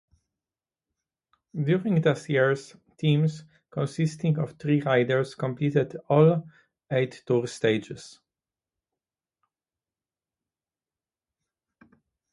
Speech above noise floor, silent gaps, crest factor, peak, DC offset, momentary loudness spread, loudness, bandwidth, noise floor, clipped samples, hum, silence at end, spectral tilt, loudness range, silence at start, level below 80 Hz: over 65 dB; none; 22 dB; -6 dBFS; under 0.1%; 10 LU; -25 LUFS; 11.5 kHz; under -90 dBFS; under 0.1%; none; 4.25 s; -7 dB/octave; 6 LU; 1.55 s; -70 dBFS